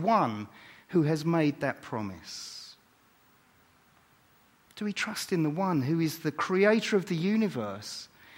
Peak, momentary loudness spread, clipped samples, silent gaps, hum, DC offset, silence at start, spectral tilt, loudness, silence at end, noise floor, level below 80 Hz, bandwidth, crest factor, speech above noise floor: -10 dBFS; 15 LU; under 0.1%; none; none; under 0.1%; 0 s; -6 dB/octave; -29 LUFS; 0.3 s; -63 dBFS; -72 dBFS; 16.5 kHz; 20 dB; 35 dB